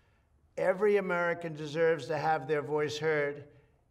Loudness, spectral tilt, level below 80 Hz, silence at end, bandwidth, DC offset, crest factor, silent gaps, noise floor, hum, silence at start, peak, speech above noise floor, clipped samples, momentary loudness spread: -31 LUFS; -5.5 dB/octave; -70 dBFS; 0.45 s; 12 kHz; under 0.1%; 14 dB; none; -67 dBFS; none; 0.55 s; -16 dBFS; 37 dB; under 0.1%; 9 LU